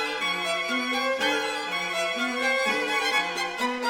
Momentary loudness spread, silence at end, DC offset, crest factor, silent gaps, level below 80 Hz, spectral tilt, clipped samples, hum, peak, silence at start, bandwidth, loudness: 4 LU; 0 s; under 0.1%; 16 dB; none; -68 dBFS; -1.5 dB/octave; under 0.1%; none; -12 dBFS; 0 s; over 20 kHz; -25 LUFS